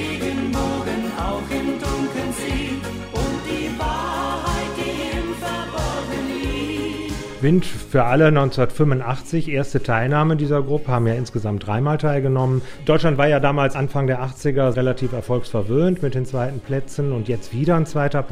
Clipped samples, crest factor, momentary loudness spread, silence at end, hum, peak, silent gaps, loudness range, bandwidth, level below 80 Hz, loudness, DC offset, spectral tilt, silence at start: under 0.1%; 18 dB; 8 LU; 0 s; none; -2 dBFS; none; 6 LU; 16 kHz; -36 dBFS; -21 LUFS; under 0.1%; -6.5 dB/octave; 0 s